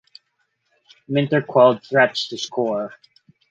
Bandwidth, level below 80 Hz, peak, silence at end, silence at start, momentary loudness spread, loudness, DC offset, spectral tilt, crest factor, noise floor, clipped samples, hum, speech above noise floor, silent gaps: 7.8 kHz; -68 dBFS; -2 dBFS; 0.65 s; 1.1 s; 10 LU; -19 LUFS; under 0.1%; -5.5 dB/octave; 20 dB; -71 dBFS; under 0.1%; none; 52 dB; none